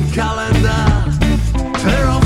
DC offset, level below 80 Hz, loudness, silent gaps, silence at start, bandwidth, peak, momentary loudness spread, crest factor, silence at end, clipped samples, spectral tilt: under 0.1%; -18 dBFS; -15 LUFS; none; 0 s; 13.5 kHz; -2 dBFS; 4 LU; 12 dB; 0 s; under 0.1%; -6 dB/octave